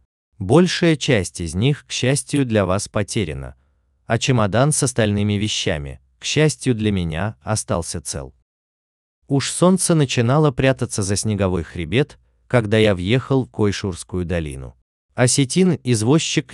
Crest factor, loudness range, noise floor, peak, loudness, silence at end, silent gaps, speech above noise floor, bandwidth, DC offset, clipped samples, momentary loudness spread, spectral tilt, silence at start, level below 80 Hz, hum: 18 dB; 3 LU; -60 dBFS; 0 dBFS; -19 LUFS; 0 s; 8.42-9.22 s, 14.82-15.09 s; 42 dB; 12.5 kHz; under 0.1%; under 0.1%; 11 LU; -5 dB/octave; 0.4 s; -42 dBFS; none